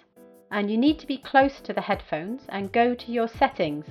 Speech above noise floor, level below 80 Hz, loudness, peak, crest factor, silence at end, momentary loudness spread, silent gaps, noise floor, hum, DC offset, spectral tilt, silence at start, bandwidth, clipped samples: 28 dB; -52 dBFS; -25 LUFS; -6 dBFS; 20 dB; 0 s; 10 LU; none; -53 dBFS; none; under 0.1%; -7 dB/octave; 0.5 s; 13 kHz; under 0.1%